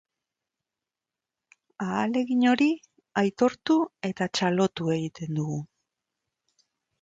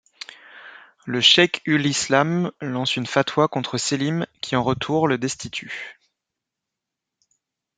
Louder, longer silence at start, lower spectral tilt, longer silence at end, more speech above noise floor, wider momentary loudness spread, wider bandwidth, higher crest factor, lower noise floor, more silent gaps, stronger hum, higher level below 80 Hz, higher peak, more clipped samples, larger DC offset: second, -26 LUFS vs -20 LUFS; first, 1.8 s vs 0.3 s; first, -6 dB/octave vs -4 dB/octave; second, 1.35 s vs 1.85 s; about the same, 64 dB vs 63 dB; second, 10 LU vs 22 LU; second, 7.8 kHz vs 9.6 kHz; about the same, 18 dB vs 22 dB; first, -89 dBFS vs -84 dBFS; neither; neither; second, -70 dBFS vs -60 dBFS; second, -10 dBFS vs -2 dBFS; neither; neither